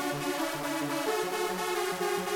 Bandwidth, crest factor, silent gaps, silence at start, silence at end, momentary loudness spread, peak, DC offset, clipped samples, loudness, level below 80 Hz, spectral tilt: 18 kHz; 14 dB; none; 0 s; 0 s; 1 LU; -18 dBFS; under 0.1%; under 0.1%; -31 LUFS; -66 dBFS; -3.5 dB/octave